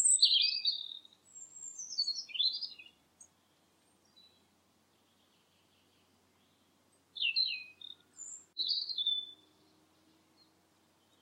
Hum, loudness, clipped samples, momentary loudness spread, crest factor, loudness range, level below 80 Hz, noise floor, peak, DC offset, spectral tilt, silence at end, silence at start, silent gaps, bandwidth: none; -31 LUFS; under 0.1%; 24 LU; 24 dB; 6 LU; under -90 dBFS; -71 dBFS; -14 dBFS; under 0.1%; 4.5 dB/octave; 1.9 s; 0 s; none; 16 kHz